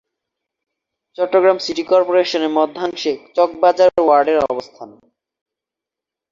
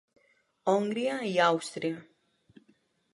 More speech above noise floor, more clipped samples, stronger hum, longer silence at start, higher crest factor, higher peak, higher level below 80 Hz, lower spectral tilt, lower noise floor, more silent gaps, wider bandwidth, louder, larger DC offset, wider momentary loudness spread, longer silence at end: first, 70 dB vs 40 dB; neither; neither; first, 1.2 s vs 0.65 s; about the same, 16 dB vs 20 dB; first, -2 dBFS vs -12 dBFS; first, -60 dBFS vs -84 dBFS; about the same, -4 dB/octave vs -4.5 dB/octave; first, -86 dBFS vs -69 dBFS; neither; second, 7.4 kHz vs 11.5 kHz; first, -16 LUFS vs -29 LUFS; neither; about the same, 9 LU vs 10 LU; first, 1.45 s vs 1.1 s